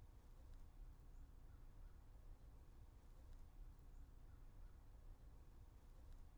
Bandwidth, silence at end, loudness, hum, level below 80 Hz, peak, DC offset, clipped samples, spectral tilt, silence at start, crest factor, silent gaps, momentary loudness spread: over 20 kHz; 0 s; -67 LUFS; none; -62 dBFS; -50 dBFS; under 0.1%; under 0.1%; -6.5 dB/octave; 0 s; 10 dB; none; 2 LU